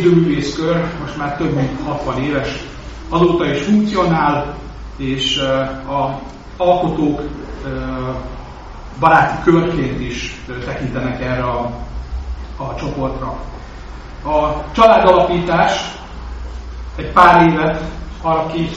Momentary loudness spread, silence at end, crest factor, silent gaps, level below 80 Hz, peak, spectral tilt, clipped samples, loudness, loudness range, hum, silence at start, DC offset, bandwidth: 19 LU; 0 s; 16 dB; none; -32 dBFS; 0 dBFS; -4.5 dB/octave; under 0.1%; -16 LUFS; 8 LU; none; 0 s; 0.2%; 8 kHz